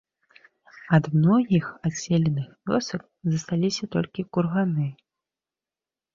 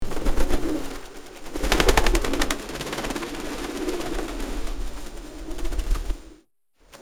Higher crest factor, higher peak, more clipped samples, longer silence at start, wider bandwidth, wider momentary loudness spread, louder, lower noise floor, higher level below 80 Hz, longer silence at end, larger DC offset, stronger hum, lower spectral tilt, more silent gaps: about the same, 20 dB vs 22 dB; second, -6 dBFS vs -2 dBFS; neither; first, 0.85 s vs 0 s; second, 7.6 kHz vs 17 kHz; second, 10 LU vs 17 LU; about the same, -25 LUFS vs -27 LUFS; first, under -90 dBFS vs -61 dBFS; second, -60 dBFS vs -28 dBFS; first, 1.2 s vs 0.05 s; neither; neither; first, -6.5 dB/octave vs -4 dB/octave; neither